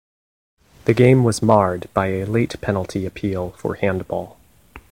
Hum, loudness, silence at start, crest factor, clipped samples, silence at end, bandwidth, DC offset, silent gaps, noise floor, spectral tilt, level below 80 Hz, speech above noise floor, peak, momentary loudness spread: none; -19 LUFS; 0.85 s; 20 dB; under 0.1%; 0.1 s; 16 kHz; 0.2%; none; -46 dBFS; -7 dB/octave; -46 dBFS; 27 dB; 0 dBFS; 13 LU